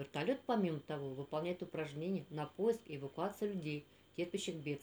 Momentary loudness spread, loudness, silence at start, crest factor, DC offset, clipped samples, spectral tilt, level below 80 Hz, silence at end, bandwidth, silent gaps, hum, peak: 8 LU; -41 LUFS; 0 s; 18 dB; under 0.1%; under 0.1%; -6 dB/octave; -78 dBFS; 0 s; over 20 kHz; none; none; -24 dBFS